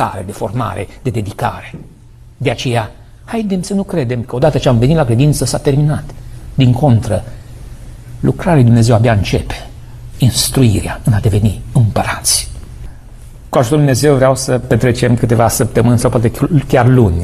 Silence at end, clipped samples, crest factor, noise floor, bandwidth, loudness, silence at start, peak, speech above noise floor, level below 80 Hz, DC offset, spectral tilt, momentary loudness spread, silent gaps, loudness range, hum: 0 s; under 0.1%; 12 dB; -33 dBFS; 14 kHz; -13 LUFS; 0 s; 0 dBFS; 21 dB; -30 dBFS; under 0.1%; -6 dB/octave; 19 LU; none; 7 LU; none